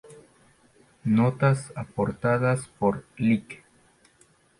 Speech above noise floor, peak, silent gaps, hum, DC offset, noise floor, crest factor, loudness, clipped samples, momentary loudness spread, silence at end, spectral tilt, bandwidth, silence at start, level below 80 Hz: 37 dB; -10 dBFS; none; none; under 0.1%; -61 dBFS; 16 dB; -25 LUFS; under 0.1%; 12 LU; 1.05 s; -7.5 dB/octave; 11.5 kHz; 0.1 s; -58 dBFS